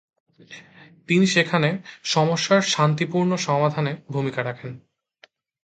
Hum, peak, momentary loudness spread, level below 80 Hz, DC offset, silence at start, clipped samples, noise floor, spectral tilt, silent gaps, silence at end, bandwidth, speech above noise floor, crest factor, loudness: none; -4 dBFS; 12 LU; -66 dBFS; under 0.1%; 0.5 s; under 0.1%; -57 dBFS; -5 dB/octave; none; 0.85 s; 9.2 kHz; 35 dB; 20 dB; -21 LUFS